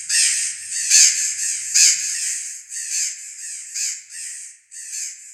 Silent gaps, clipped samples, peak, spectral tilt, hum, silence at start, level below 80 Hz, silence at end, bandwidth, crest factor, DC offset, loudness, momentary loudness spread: none; under 0.1%; 0 dBFS; 7 dB/octave; none; 0 s; -78 dBFS; 0 s; 16.5 kHz; 22 dB; under 0.1%; -17 LUFS; 19 LU